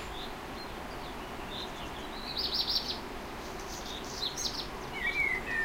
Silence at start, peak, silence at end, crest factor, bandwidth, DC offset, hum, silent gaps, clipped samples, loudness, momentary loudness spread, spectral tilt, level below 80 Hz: 0 s; -18 dBFS; 0 s; 18 dB; 16 kHz; under 0.1%; none; none; under 0.1%; -35 LUFS; 12 LU; -2 dB/octave; -48 dBFS